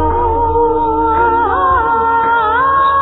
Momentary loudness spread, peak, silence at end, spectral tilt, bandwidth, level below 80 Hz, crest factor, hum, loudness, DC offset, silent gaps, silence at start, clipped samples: 2 LU; -2 dBFS; 0 s; -10 dB/octave; 4.1 kHz; -26 dBFS; 10 dB; none; -12 LUFS; under 0.1%; none; 0 s; under 0.1%